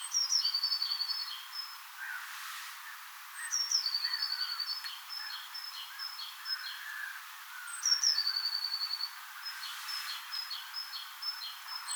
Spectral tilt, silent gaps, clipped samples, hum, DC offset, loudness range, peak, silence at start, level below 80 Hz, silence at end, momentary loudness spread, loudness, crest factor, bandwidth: 11 dB/octave; none; under 0.1%; none; under 0.1%; 5 LU; -16 dBFS; 0 s; under -90 dBFS; 0 s; 14 LU; -34 LUFS; 20 dB; over 20 kHz